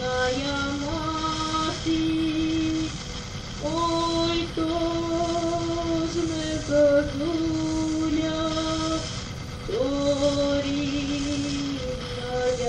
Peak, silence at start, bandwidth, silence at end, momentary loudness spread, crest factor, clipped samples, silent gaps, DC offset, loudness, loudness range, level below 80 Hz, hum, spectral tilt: -10 dBFS; 0 s; 10 kHz; 0 s; 8 LU; 16 dB; under 0.1%; none; under 0.1%; -26 LUFS; 2 LU; -40 dBFS; none; -5 dB/octave